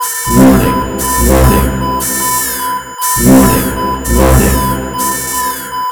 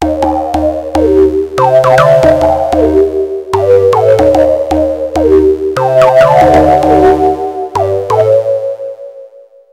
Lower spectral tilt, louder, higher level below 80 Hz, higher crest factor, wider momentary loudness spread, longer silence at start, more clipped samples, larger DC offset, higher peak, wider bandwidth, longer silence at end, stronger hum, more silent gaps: second, -4.5 dB/octave vs -7 dB/octave; about the same, -11 LUFS vs -9 LUFS; first, -18 dBFS vs -28 dBFS; about the same, 10 dB vs 8 dB; about the same, 9 LU vs 9 LU; about the same, 0 s vs 0 s; about the same, 1% vs 1%; neither; about the same, 0 dBFS vs 0 dBFS; first, over 20 kHz vs 15.5 kHz; second, 0 s vs 0.45 s; neither; neither